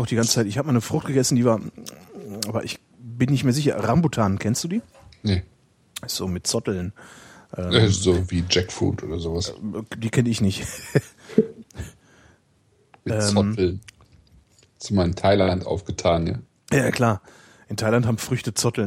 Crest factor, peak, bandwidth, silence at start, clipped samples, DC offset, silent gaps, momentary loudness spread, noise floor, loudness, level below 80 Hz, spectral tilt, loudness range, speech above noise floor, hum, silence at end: 22 dB; -2 dBFS; 16 kHz; 0 s; under 0.1%; under 0.1%; none; 16 LU; -61 dBFS; -23 LUFS; -46 dBFS; -5 dB/octave; 4 LU; 39 dB; none; 0 s